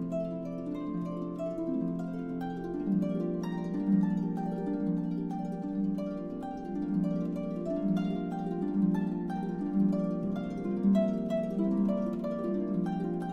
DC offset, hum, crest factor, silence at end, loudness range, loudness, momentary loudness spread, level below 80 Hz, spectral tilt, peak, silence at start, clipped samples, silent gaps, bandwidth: under 0.1%; none; 14 dB; 0 s; 3 LU; -32 LUFS; 8 LU; -56 dBFS; -10 dB/octave; -16 dBFS; 0 s; under 0.1%; none; 6.6 kHz